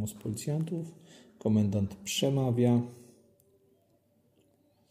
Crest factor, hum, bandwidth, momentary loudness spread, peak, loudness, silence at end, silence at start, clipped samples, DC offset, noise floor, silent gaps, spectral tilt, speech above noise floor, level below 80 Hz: 18 dB; none; 15.5 kHz; 11 LU; -14 dBFS; -30 LUFS; 1.9 s; 0 s; under 0.1%; under 0.1%; -69 dBFS; none; -6 dB/octave; 39 dB; -66 dBFS